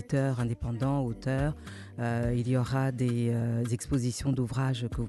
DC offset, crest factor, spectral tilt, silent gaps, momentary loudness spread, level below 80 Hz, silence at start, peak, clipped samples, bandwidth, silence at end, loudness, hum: under 0.1%; 12 dB; -7 dB/octave; none; 4 LU; -46 dBFS; 0 s; -18 dBFS; under 0.1%; 12.5 kHz; 0 s; -30 LUFS; none